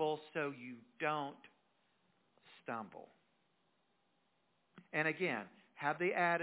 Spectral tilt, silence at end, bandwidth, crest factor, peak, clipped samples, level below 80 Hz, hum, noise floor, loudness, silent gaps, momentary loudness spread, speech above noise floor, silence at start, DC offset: -3.5 dB/octave; 0 s; 4 kHz; 20 dB; -22 dBFS; under 0.1%; under -90 dBFS; none; -79 dBFS; -39 LUFS; none; 18 LU; 40 dB; 0 s; under 0.1%